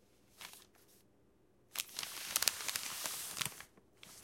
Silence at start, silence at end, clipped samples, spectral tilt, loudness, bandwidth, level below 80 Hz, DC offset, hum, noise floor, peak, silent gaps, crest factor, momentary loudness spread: 0.35 s; 0 s; under 0.1%; 1 dB/octave; -38 LUFS; 17 kHz; -78 dBFS; under 0.1%; none; -71 dBFS; -6 dBFS; none; 38 dB; 23 LU